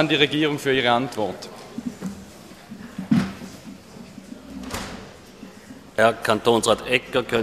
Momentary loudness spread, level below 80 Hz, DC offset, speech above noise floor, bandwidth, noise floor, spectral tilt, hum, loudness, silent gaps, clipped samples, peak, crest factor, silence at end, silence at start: 23 LU; -52 dBFS; under 0.1%; 23 dB; 15 kHz; -43 dBFS; -4.5 dB/octave; none; -22 LUFS; none; under 0.1%; -2 dBFS; 22 dB; 0 s; 0 s